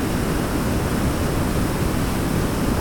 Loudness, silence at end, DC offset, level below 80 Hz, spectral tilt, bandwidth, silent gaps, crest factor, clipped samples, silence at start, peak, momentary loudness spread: -22 LUFS; 0 s; under 0.1%; -28 dBFS; -5.5 dB/octave; 19.5 kHz; none; 12 dB; under 0.1%; 0 s; -10 dBFS; 1 LU